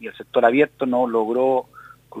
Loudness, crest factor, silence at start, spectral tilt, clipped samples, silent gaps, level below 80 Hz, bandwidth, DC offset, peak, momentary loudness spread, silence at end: -20 LUFS; 18 dB; 0 s; -7 dB/octave; under 0.1%; none; -66 dBFS; 14.5 kHz; under 0.1%; -2 dBFS; 7 LU; 0 s